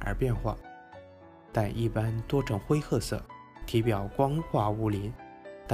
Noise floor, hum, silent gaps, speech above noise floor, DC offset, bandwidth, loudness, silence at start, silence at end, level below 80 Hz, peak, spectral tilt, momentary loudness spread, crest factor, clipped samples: -52 dBFS; none; none; 23 dB; under 0.1%; 15.5 kHz; -30 LUFS; 0 s; 0 s; -44 dBFS; -12 dBFS; -7 dB/octave; 18 LU; 20 dB; under 0.1%